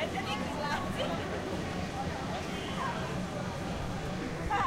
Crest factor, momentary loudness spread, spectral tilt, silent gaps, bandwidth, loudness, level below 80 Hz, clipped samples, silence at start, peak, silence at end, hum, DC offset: 16 dB; 3 LU; -5 dB/octave; none; 16 kHz; -35 LUFS; -48 dBFS; under 0.1%; 0 s; -20 dBFS; 0 s; none; under 0.1%